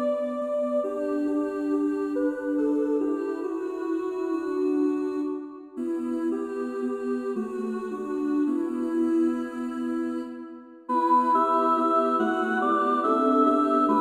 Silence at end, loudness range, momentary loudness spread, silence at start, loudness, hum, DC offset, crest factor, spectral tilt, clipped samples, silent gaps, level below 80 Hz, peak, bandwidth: 0 s; 6 LU; 9 LU; 0 s; -26 LUFS; none; under 0.1%; 16 dB; -6 dB/octave; under 0.1%; none; -68 dBFS; -10 dBFS; 10.5 kHz